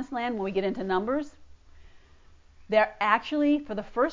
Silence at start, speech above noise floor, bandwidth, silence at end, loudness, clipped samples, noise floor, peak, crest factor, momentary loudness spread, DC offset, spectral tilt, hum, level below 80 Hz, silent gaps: 0 s; 28 dB; 7.6 kHz; 0 s; -27 LUFS; under 0.1%; -54 dBFS; -6 dBFS; 22 dB; 7 LU; under 0.1%; -6.5 dB/octave; none; -56 dBFS; none